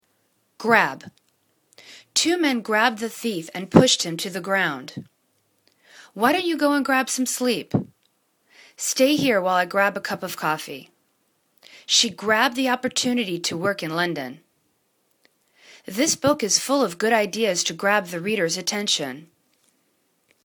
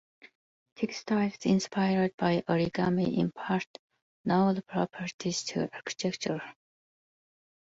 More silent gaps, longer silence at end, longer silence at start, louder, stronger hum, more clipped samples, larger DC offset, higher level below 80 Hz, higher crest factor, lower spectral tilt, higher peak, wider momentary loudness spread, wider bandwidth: second, none vs 2.14-2.18 s, 3.67-3.90 s, 4.02-4.24 s, 5.14-5.19 s; about the same, 1.2 s vs 1.2 s; second, 0.6 s vs 0.8 s; first, -21 LUFS vs -30 LUFS; neither; neither; neither; about the same, -62 dBFS vs -66 dBFS; first, 24 dB vs 18 dB; second, -3 dB/octave vs -5.5 dB/octave; first, 0 dBFS vs -14 dBFS; first, 13 LU vs 8 LU; first, 19.5 kHz vs 8 kHz